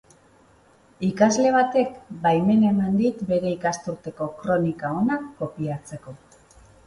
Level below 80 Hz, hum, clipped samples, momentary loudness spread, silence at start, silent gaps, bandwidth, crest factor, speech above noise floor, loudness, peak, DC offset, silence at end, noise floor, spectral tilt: -58 dBFS; none; under 0.1%; 13 LU; 1 s; none; 11 kHz; 20 dB; 34 dB; -23 LUFS; -4 dBFS; under 0.1%; 0.7 s; -56 dBFS; -6 dB/octave